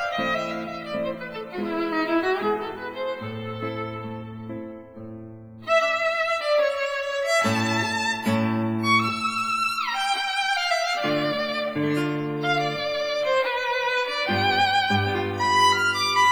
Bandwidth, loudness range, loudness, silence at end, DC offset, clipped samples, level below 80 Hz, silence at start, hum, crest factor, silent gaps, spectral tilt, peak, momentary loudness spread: over 20 kHz; 6 LU; -24 LUFS; 0 s; under 0.1%; under 0.1%; -62 dBFS; 0 s; none; 16 dB; none; -4 dB/octave; -8 dBFS; 13 LU